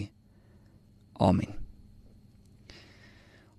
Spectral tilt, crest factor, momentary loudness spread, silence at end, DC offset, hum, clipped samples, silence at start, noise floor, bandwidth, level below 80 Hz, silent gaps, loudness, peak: -8 dB/octave; 24 dB; 27 LU; 1.85 s; under 0.1%; none; under 0.1%; 0 s; -59 dBFS; 11 kHz; -52 dBFS; none; -29 LUFS; -10 dBFS